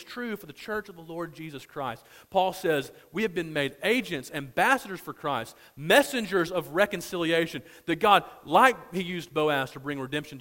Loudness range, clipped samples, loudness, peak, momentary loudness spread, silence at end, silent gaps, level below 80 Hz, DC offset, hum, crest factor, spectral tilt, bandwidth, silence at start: 6 LU; under 0.1%; -27 LUFS; -4 dBFS; 16 LU; 0 s; none; -62 dBFS; under 0.1%; none; 24 dB; -4 dB/octave; 16.5 kHz; 0 s